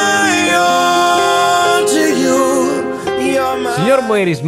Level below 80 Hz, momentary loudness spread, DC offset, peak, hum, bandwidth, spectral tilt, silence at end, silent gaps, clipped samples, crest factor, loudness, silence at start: -52 dBFS; 5 LU; under 0.1%; -2 dBFS; none; 16 kHz; -3.5 dB/octave; 0 s; none; under 0.1%; 12 dB; -13 LUFS; 0 s